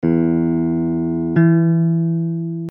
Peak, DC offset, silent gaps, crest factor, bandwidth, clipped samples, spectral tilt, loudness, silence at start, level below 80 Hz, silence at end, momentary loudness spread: -4 dBFS; under 0.1%; none; 12 dB; 2.9 kHz; under 0.1%; -12.5 dB/octave; -17 LUFS; 0 s; -48 dBFS; 0 s; 7 LU